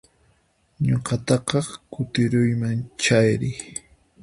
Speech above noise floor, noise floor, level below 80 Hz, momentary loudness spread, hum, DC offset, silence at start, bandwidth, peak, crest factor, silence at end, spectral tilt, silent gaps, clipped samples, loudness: 42 dB; -63 dBFS; -52 dBFS; 14 LU; none; under 0.1%; 0.8 s; 11.5 kHz; -4 dBFS; 18 dB; 0.45 s; -5.5 dB/octave; none; under 0.1%; -23 LUFS